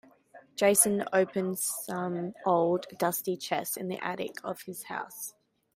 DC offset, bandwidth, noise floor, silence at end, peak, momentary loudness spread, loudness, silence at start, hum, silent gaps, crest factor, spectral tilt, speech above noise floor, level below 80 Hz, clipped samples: under 0.1%; 16 kHz; -56 dBFS; 0.45 s; -10 dBFS; 15 LU; -29 LUFS; 0.35 s; none; none; 22 dB; -3.5 dB/octave; 27 dB; -74 dBFS; under 0.1%